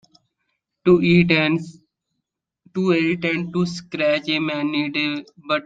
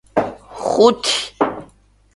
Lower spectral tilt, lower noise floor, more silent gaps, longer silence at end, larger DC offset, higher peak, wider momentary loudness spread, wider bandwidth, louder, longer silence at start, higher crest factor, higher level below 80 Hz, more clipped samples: first, -6.5 dB/octave vs -3 dB/octave; first, -80 dBFS vs -52 dBFS; neither; second, 0.05 s vs 0.5 s; neither; about the same, -2 dBFS vs 0 dBFS; second, 10 LU vs 14 LU; second, 7.8 kHz vs 11.5 kHz; about the same, -20 LUFS vs -18 LUFS; first, 0.85 s vs 0.15 s; about the same, 18 dB vs 18 dB; second, -58 dBFS vs -52 dBFS; neither